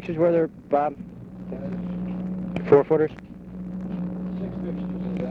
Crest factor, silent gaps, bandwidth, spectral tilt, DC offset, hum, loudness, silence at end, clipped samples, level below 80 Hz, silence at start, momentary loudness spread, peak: 20 dB; none; 5.8 kHz; -10 dB/octave; under 0.1%; none; -25 LUFS; 0 s; under 0.1%; -50 dBFS; 0 s; 18 LU; -4 dBFS